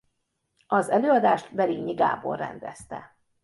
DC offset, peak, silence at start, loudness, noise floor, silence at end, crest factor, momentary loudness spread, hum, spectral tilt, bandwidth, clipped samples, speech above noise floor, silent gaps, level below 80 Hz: under 0.1%; -8 dBFS; 0.7 s; -24 LUFS; -76 dBFS; 0.4 s; 18 dB; 19 LU; none; -6 dB/octave; 11.5 kHz; under 0.1%; 52 dB; none; -66 dBFS